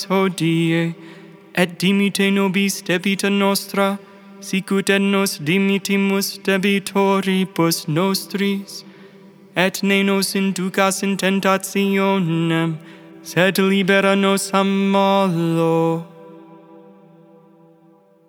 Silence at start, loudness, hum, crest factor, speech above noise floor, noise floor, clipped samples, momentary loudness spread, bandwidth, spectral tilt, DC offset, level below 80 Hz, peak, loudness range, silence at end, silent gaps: 0 s; -18 LUFS; none; 18 dB; 34 dB; -52 dBFS; under 0.1%; 8 LU; 18.5 kHz; -5 dB/octave; under 0.1%; -78 dBFS; 0 dBFS; 3 LU; 1.9 s; none